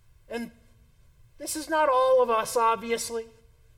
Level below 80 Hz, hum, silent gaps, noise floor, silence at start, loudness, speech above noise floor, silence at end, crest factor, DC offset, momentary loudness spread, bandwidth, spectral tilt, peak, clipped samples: -60 dBFS; none; none; -57 dBFS; 0.3 s; -25 LUFS; 33 dB; 0.5 s; 14 dB; under 0.1%; 16 LU; 17 kHz; -2.5 dB/octave; -12 dBFS; under 0.1%